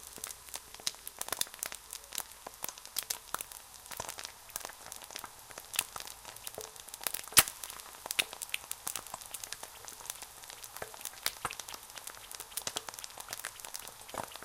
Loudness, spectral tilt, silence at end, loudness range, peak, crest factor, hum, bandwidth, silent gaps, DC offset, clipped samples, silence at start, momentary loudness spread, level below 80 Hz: -37 LUFS; 0.5 dB/octave; 0 s; 9 LU; -4 dBFS; 36 dB; none; 17 kHz; none; under 0.1%; under 0.1%; 0 s; 11 LU; -66 dBFS